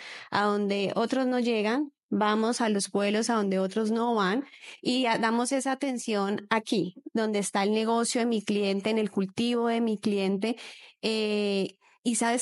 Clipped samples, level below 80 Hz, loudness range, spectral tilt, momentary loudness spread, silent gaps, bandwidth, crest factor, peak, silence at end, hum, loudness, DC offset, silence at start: under 0.1%; -88 dBFS; 1 LU; -4.5 dB/octave; 5 LU; 2.03-2.09 s, 11.98-12.03 s; 12 kHz; 18 dB; -10 dBFS; 0 s; none; -28 LUFS; under 0.1%; 0 s